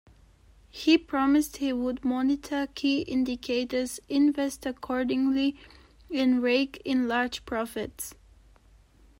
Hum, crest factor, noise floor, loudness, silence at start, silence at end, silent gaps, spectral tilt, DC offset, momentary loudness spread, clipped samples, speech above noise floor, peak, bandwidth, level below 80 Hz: none; 18 dB; -58 dBFS; -27 LUFS; 0.75 s; 1.05 s; none; -3.5 dB/octave; under 0.1%; 10 LU; under 0.1%; 31 dB; -8 dBFS; 16 kHz; -56 dBFS